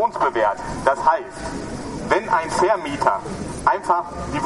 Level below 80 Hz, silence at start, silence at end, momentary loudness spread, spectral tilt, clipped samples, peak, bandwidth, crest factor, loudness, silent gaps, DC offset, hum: -42 dBFS; 0 s; 0 s; 11 LU; -5 dB/octave; under 0.1%; 0 dBFS; 11.5 kHz; 20 dB; -21 LUFS; none; under 0.1%; none